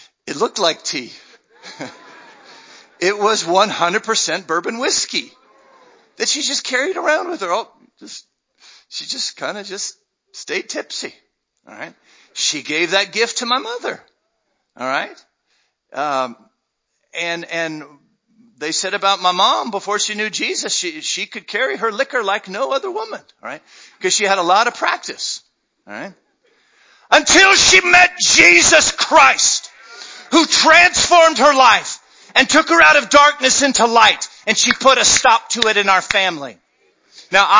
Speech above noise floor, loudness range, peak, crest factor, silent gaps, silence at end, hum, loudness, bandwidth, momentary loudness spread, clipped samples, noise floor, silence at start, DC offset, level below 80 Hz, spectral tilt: 56 dB; 15 LU; 0 dBFS; 16 dB; none; 0 s; none; -14 LUFS; 8 kHz; 23 LU; under 0.1%; -72 dBFS; 0.25 s; under 0.1%; -52 dBFS; -0.5 dB/octave